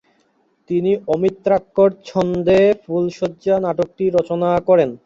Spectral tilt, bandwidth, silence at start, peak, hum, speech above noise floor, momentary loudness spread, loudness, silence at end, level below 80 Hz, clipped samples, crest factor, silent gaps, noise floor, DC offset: -7.5 dB/octave; 7.6 kHz; 0.7 s; -4 dBFS; none; 45 dB; 7 LU; -18 LUFS; 0.1 s; -50 dBFS; under 0.1%; 14 dB; none; -61 dBFS; under 0.1%